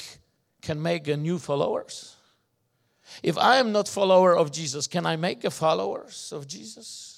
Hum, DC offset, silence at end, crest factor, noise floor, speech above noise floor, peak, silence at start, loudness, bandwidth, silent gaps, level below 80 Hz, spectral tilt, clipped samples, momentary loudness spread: none; under 0.1%; 0.05 s; 20 dB; -72 dBFS; 47 dB; -6 dBFS; 0 s; -24 LUFS; 14.5 kHz; none; -70 dBFS; -4.5 dB/octave; under 0.1%; 19 LU